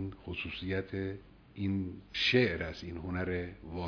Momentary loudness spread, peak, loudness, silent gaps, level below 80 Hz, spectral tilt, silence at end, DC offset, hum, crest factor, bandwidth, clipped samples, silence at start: 14 LU; -14 dBFS; -34 LUFS; none; -54 dBFS; -6 dB/octave; 0 s; under 0.1%; none; 20 dB; 5.4 kHz; under 0.1%; 0 s